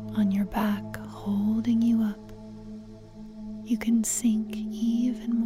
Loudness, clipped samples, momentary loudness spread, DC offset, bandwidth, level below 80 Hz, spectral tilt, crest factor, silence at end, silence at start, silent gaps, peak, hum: -27 LUFS; under 0.1%; 19 LU; under 0.1%; 16 kHz; -52 dBFS; -5.5 dB/octave; 14 dB; 0 s; 0 s; none; -14 dBFS; none